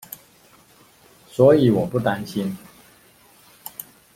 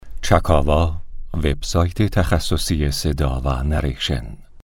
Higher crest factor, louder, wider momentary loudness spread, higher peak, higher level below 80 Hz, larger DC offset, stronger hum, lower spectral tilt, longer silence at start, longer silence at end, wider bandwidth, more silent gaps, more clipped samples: about the same, 20 dB vs 18 dB; about the same, -19 LUFS vs -20 LUFS; first, 24 LU vs 7 LU; about the same, -2 dBFS vs 0 dBFS; second, -56 dBFS vs -24 dBFS; neither; neither; first, -7 dB/octave vs -5.5 dB/octave; first, 1.4 s vs 0.05 s; first, 0.35 s vs 0 s; about the same, 16.5 kHz vs 17 kHz; neither; neither